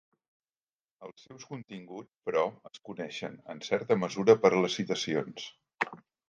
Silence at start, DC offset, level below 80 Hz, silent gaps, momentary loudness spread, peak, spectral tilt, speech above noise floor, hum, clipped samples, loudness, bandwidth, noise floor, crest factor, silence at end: 1 s; under 0.1%; -76 dBFS; none; 25 LU; -8 dBFS; -5 dB/octave; over 59 dB; none; under 0.1%; -30 LUFS; 7.4 kHz; under -90 dBFS; 24 dB; 0.35 s